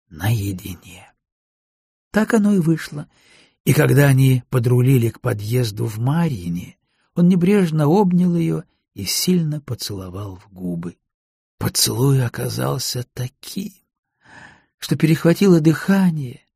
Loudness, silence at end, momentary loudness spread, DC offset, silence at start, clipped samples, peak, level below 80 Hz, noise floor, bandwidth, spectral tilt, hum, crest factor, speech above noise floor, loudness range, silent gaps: -18 LUFS; 0.25 s; 16 LU; under 0.1%; 0.1 s; under 0.1%; -2 dBFS; -50 dBFS; -45 dBFS; 15.5 kHz; -6 dB/octave; none; 18 dB; 27 dB; 5 LU; 1.32-2.11 s, 3.60-3.64 s, 11.14-11.58 s, 13.98-14.03 s, 14.74-14.78 s